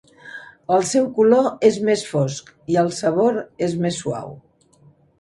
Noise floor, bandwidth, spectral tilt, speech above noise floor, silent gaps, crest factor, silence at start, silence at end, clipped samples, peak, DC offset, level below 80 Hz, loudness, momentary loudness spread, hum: -54 dBFS; 11.5 kHz; -5.5 dB/octave; 35 dB; none; 18 dB; 0.25 s; 0.85 s; under 0.1%; -2 dBFS; under 0.1%; -60 dBFS; -19 LUFS; 19 LU; none